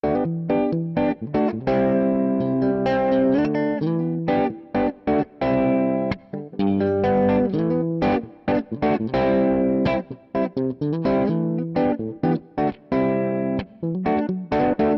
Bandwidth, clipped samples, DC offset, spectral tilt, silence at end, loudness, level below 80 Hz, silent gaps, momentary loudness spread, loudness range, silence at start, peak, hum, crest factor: 6 kHz; under 0.1%; under 0.1%; -10 dB/octave; 0 s; -22 LUFS; -48 dBFS; none; 6 LU; 2 LU; 0.05 s; -10 dBFS; none; 12 dB